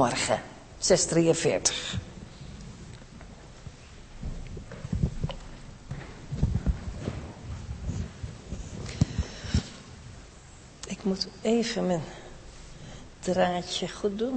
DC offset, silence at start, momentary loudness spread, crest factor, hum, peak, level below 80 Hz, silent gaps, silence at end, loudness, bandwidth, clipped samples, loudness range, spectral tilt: under 0.1%; 0 s; 22 LU; 22 dB; none; -8 dBFS; -40 dBFS; none; 0 s; -29 LUFS; 8.8 kHz; under 0.1%; 10 LU; -4.5 dB/octave